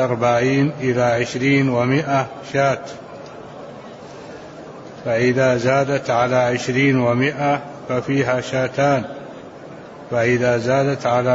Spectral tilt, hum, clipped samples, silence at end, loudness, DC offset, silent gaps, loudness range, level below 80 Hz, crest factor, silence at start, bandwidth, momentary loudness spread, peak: -6 dB/octave; none; under 0.1%; 0 s; -18 LUFS; under 0.1%; none; 5 LU; -54 dBFS; 14 dB; 0 s; 8 kHz; 20 LU; -4 dBFS